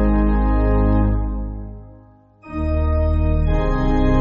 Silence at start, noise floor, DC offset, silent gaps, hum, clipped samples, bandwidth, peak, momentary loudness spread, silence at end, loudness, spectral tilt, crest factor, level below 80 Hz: 0 s; -47 dBFS; under 0.1%; none; 50 Hz at -60 dBFS; under 0.1%; 5.2 kHz; -6 dBFS; 14 LU; 0 s; -20 LUFS; -8.5 dB/octave; 12 dB; -20 dBFS